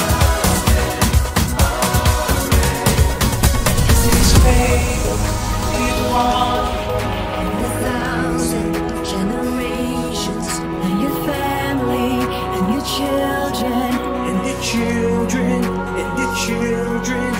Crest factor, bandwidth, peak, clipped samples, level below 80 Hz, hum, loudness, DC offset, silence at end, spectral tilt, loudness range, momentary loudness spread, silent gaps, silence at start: 16 dB; 16.5 kHz; 0 dBFS; under 0.1%; -22 dBFS; none; -18 LUFS; under 0.1%; 0 s; -4.5 dB/octave; 5 LU; 6 LU; none; 0 s